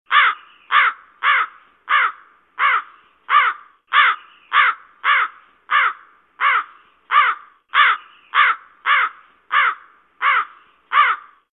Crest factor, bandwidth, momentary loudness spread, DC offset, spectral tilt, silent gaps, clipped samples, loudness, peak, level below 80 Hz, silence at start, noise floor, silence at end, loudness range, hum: 18 dB; 4.2 kHz; 10 LU; under 0.1%; -1 dB/octave; none; under 0.1%; -17 LUFS; -2 dBFS; -80 dBFS; 0.1 s; -42 dBFS; 0.35 s; 1 LU; none